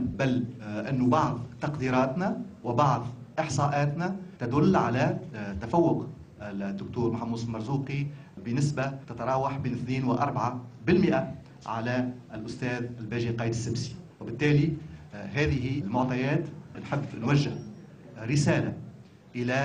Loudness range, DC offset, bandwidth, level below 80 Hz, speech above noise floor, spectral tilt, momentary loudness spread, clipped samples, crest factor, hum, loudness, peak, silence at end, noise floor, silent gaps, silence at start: 3 LU; under 0.1%; 9.8 kHz; -56 dBFS; 21 dB; -7 dB/octave; 15 LU; under 0.1%; 18 dB; none; -29 LUFS; -10 dBFS; 0 s; -49 dBFS; none; 0 s